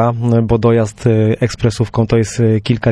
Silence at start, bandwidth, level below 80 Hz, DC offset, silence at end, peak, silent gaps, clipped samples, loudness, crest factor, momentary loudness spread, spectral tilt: 0 s; 10.5 kHz; -34 dBFS; under 0.1%; 0 s; -2 dBFS; none; under 0.1%; -14 LUFS; 12 dB; 4 LU; -7 dB/octave